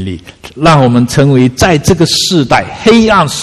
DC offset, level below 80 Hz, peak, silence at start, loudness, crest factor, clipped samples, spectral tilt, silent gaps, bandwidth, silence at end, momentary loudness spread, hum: under 0.1%; -30 dBFS; 0 dBFS; 0 s; -8 LUFS; 8 dB; 1%; -5 dB/octave; none; 13.5 kHz; 0 s; 5 LU; none